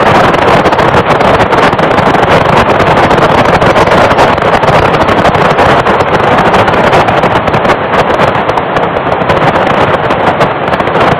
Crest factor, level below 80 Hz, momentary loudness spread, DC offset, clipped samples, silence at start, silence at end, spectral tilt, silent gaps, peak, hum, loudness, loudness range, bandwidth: 6 dB; -28 dBFS; 4 LU; 0.5%; 3%; 0 s; 0 s; -6 dB/octave; none; 0 dBFS; none; -7 LUFS; 2 LU; 14.5 kHz